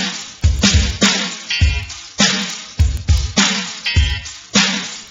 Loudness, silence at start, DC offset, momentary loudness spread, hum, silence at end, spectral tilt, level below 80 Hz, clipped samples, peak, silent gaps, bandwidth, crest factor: -16 LUFS; 0 s; under 0.1%; 9 LU; none; 0 s; -3 dB/octave; -22 dBFS; under 0.1%; 0 dBFS; none; 7.8 kHz; 16 dB